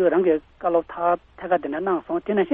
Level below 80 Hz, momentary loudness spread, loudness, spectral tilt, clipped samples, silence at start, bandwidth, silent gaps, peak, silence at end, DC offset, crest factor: -56 dBFS; 4 LU; -23 LUFS; -10 dB/octave; under 0.1%; 0 s; 3.8 kHz; none; -8 dBFS; 0 s; under 0.1%; 14 dB